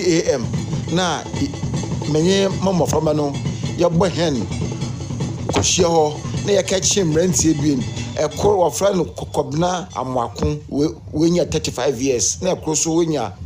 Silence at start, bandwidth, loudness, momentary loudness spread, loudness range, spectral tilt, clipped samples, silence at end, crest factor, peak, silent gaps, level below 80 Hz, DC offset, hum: 0 s; 15.5 kHz; -19 LUFS; 8 LU; 3 LU; -4.5 dB/octave; under 0.1%; 0 s; 16 dB; -4 dBFS; none; -40 dBFS; under 0.1%; none